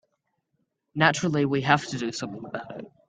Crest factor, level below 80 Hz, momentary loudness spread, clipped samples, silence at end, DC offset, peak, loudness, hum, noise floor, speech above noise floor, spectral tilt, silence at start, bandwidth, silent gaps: 26 dB; -64 dBFS; 14 LU; under 0.1%; 0.2 s; under 0.1%; -2 dBFS; -24 LUFS; none; -76 dBFS; 50 dB; -5 dB/octave; 0.95 s; 9.4 kHz; none